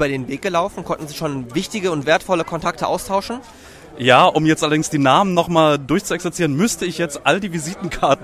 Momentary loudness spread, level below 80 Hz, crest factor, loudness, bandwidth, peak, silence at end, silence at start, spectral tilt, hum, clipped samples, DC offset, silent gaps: 11 LU; -46 dBFS; 18 dB; -18 LUFS; 15.5 kHz; 0 dBFS; 0 s; 0 s; -4.5 dB/octave; none; under 0.1%; under 0.1%; none